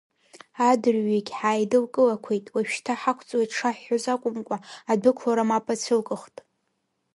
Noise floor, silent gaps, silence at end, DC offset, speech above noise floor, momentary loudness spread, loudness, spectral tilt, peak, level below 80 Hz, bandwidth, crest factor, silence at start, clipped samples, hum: -75 dBFS; none; 0.9 s; under 0.1%; 51 dB; 8 LU; -25 LUFS; -4.5 dB/octave; -6 dBFS; -74 dBFS; 11.5 kHz; 18 dB; 0.55 s; under 0.1%; none